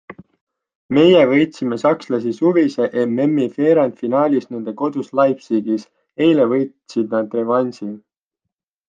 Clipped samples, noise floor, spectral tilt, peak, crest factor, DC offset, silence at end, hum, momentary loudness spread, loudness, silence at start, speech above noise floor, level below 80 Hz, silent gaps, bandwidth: under 0.1%; -81 dBFS; -7 dB/octave; -2 dBFS; 16 dB; under 0.1%; 0.9 s; none; 10 LU; -17 LUFS; 0.1 s; 65 dB; -64 dBFS; 0.41-0.47 s, 0.75-0.89 s; 7.6 kHz